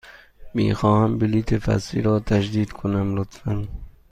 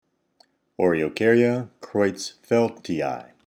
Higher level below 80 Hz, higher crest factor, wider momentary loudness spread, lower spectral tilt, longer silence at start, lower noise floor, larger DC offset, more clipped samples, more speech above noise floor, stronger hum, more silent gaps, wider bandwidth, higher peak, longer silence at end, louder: first, -38 dBFS vs -62 dBFS; about the same, 16 dB vs 18 dB; about the same, 10 LU vs 10 LU; first, -7.5 dB/octave vs -6 dB/octave; second, 0.05 s vs 0.8 s; second, -42 dBFS vs -63 dBFS; neither; neither; second, 21 dB vs 40 dB; neither; neither; second, 9.6 kHz vs 14 kHz; about the same, -6 dBFS vs -6 dBFS; about the same, 0.2 s vs 0.25 s; about the same, -22 LUFS vs -23 LUFS